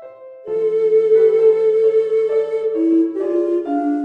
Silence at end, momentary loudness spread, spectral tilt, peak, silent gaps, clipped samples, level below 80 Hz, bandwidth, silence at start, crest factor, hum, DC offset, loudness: 0 s; 7 LU; -7.5 dB/octave; -4 dBFS; none; under 0.1%; -70 dBFS; 4.2 kHz; 0 s; 12 dB; none; under 0.1%; -16 LUFS